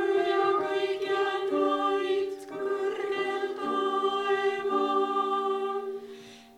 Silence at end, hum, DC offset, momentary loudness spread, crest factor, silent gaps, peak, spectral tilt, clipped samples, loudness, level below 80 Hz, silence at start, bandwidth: 0.15 s; none; under 0.1%; 9 LU; 16 dB; none; -12 dBFS; -4 dB/octave; under 0.1%; -28 LUFS; -76 dBFS; 0 s; 11 kHz